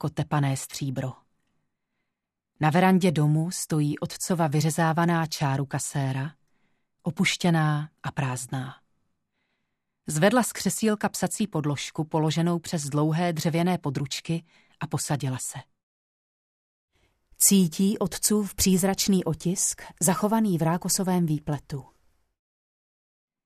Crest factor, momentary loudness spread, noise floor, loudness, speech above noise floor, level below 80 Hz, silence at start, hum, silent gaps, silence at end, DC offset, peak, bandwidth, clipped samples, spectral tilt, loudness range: 20 dB; 11 LU; -84 dBFS; -25 LUFS; 59 dB; -56 dBFS; 0 s; none; 15.83-16.88 s; 1.65 s; under 0.1%; -6 dBFS; 14 kHz; under 0.1%; -5 dB/octave; 5 LU